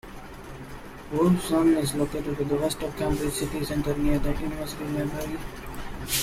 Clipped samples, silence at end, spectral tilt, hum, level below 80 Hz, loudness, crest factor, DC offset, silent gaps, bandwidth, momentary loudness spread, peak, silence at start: under 0.1%; 0 s; -5.5 dB/octave; none; -38 dBFS; -27 LUFS; 16 dB; under 0.1%; none; 16 kHz; 19 LU; -10 dBFS; 0.05 s